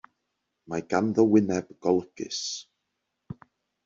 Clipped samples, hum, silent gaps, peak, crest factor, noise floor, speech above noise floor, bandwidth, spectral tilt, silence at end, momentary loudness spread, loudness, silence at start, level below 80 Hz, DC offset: under 0.1%; none; none; -8 dBFS; 20 dB; -81 dBFS; 56 dB; 7.6 kHz; -5.5 dB/octave; 0.5 s; 24 LU; -26 LUFS; 0.7 s; -66 dBFS; under 0.1%